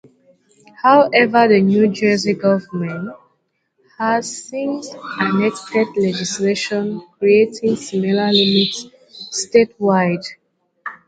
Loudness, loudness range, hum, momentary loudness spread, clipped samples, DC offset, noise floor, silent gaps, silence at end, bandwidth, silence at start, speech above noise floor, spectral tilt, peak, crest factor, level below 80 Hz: -17 LUFS; 6 LU; none; 14 LU; under 0.1%; under 0.1%; -67 dBFS; none; 0.1 s; 9.4 kHz; 0.8 s; 51 dB; -4.5 dB/octave; 0 dBFS; 18 dB; -62 dBFS